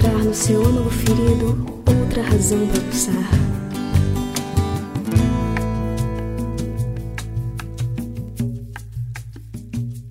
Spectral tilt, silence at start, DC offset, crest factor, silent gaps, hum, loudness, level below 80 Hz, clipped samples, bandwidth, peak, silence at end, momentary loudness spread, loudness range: -6 dB/octave; 0 s; under 0.1%; 16 dB; none; none; -21 LUFS; -30 dBFS; under 0.1%; 16 kHz; -4 dBFS; 0 s; 13 LU; 9 LU